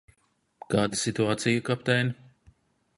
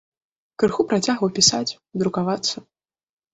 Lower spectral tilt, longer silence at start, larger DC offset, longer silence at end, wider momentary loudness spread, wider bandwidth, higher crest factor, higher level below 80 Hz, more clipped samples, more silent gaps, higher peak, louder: about the same, -4.5 dB/octave vs -3.5 dB/octave; about the same, 0.7 s vs 0.6 s; neither; first, 0.85 s vs 0.7 s; second, 5 LU vs 10 LU; first, 11.5 kHz vs 8.4 kHz; about the same, 20 dB vs 20 dB; about the same, -60 dBFS vs -58 dBFS; neither; neither; second, -8 dBFS vs -4 dBFS; second, -27 LUFS vs -21 LUFS